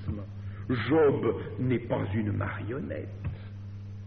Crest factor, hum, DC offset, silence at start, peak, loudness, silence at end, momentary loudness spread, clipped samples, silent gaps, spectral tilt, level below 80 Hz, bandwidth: 16 dB; none; under 0.1%; 0 s; -14 dBFS; -30 LUFS; 0 s; 17 LU; under 0.1%; none; -7 dB/octave; -52 dBFS; 4.9 kHz